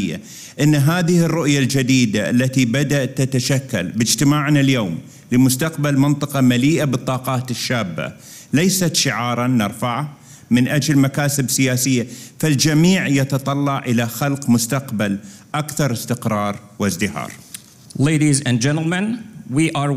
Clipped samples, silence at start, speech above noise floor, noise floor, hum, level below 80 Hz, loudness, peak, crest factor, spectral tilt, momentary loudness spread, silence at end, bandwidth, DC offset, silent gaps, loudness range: under 0.1%; 0 s; 22 dB; -39 dBFS; none; -50 dBFS; -18 LUFS; -2 dBFS; 14 dB; -5 dB/octave; 10 LU; 0 s; 16 kHz; under 0.1%; none; 4 LU